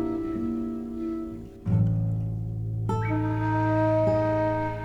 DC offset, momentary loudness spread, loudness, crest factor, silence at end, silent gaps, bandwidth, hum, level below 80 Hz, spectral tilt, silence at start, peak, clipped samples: under 0.1%; 9 LU; -27 LUFS; 14 dB; 0 s; none; 6 kHz; none; -44 dBFS; -9.5 dB/octave; 0 s; -12 dBFS; under 0.1%